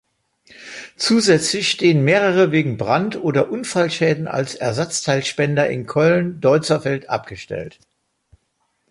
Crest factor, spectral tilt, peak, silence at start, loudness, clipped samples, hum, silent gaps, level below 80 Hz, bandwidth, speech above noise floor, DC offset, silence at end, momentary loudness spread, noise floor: 16 dB; -5 dB/octave; -2 dBFS; 0.6 s; -18 LUFS; under 0.1%; none; none; -56 dBFS; 11.5 kHz; 51 dB; under 0.1%; 1.2 s; 14 LU; -69 dBFS